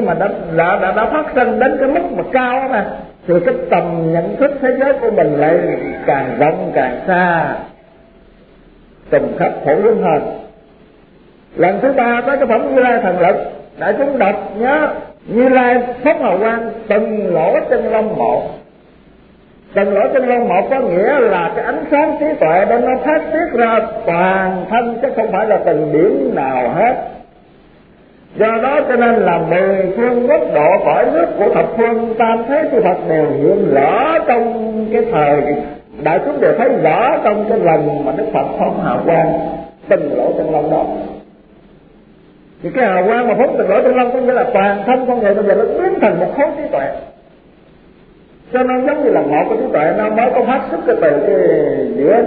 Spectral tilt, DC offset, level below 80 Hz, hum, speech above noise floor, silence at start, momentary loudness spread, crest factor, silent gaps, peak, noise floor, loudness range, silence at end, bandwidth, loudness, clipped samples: -11 dB/octave; 0.2%; -46 dBFS; none; 31 dB; 0 s; 6 LU; 14 dB; none; 0 dBFS; -45 dBFS; 4 LU; 0 s; 4.7 kHz; -14 LUFS; under 0.1%